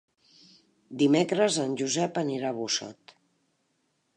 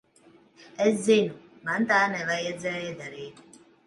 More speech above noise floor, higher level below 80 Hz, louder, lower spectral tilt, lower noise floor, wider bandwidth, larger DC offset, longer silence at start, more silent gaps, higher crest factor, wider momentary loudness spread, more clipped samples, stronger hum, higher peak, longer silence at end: first, 48 dB vs 32 dB; second, -80 dBFS vs -72 dBFS; about the same, -27 LUFS vs -26 LUFS; about the same, -4 dB/octave vs -4.5 dB/octave; first, -74 dBFS vs -58 dBFS; about the same, 10.5 kHz vs 11.5 kHz; neither; first, 0.9 s vs 0.6 s; neither; about the same, 18 dB vs 20 dB; second, 8 LU vs 18 LU; neither; neither; about the same, -10 dBFS vs -8 dBFS; first, 1.25 s vs 0.55 s